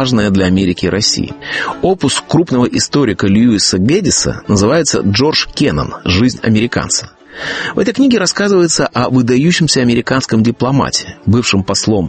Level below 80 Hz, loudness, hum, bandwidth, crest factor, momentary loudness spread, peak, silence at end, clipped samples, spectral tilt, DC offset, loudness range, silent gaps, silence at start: -38 dBFS; -12 LUFS; none; 8.8 kHz; 12 dB; 6 LU; 0 dBFS; 0 s; under 0.1%; -4.5 dB/octave; under 0.1%; 2 LU; none; 0 s